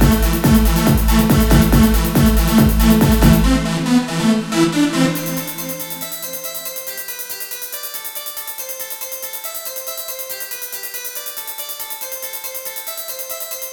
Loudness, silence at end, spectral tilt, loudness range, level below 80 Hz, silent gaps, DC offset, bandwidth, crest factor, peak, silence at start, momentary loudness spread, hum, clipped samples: -18 LUFS; 0 s; -5 dB/octave; 11 LU; -22 dBFS; none; under 0.1%; 20 kHz; 16 dB; 0 dBFS; 0 s; 12 LU; none; under 0.1%